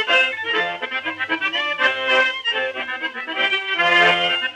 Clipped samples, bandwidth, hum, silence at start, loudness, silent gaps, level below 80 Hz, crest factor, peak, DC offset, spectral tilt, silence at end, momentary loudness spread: under 0.1%; 11.5 kHz; none; 0 s; -18 LUFS; none; -74 dBFS; 16 dB; -4 dBFS; under 0.1%; -2.5 dB/octave; 0 s; 11 LU